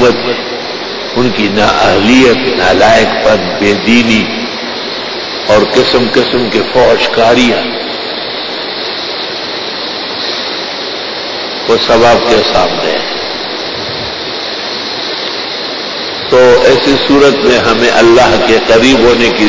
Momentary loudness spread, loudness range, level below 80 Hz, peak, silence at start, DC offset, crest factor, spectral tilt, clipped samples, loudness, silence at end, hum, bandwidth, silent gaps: 10 LU; 8 LU; -36 dBFS; 0 dBFS; 0 s; under 0.1%; 10 dB; -4 dB/octave; 0.3%; -9 LUFS; 0 s; none; 8 kHz; none